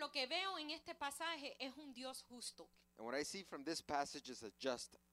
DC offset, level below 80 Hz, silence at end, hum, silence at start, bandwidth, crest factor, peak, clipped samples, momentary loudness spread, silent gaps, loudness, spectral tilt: under 0.1%; -80 dBFS; 0.15 s; none; 0 s; 15.5 kHz; 22 dB; -26 dBFS; under 0.1%; 10 LU; none; -46 LUFS; -2 dB/octave